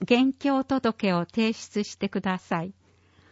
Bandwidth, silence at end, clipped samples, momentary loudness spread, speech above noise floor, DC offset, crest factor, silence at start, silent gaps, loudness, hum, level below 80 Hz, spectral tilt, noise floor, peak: 8 kHz; 0.6 s; under 0.1%; 8 LU; 34 dB; under 0.1%; 18 dB; 0 s; none; -26 LUFS; none; -62 dBFS; -6 dB/octave; -59 dBFS; -8 dBFS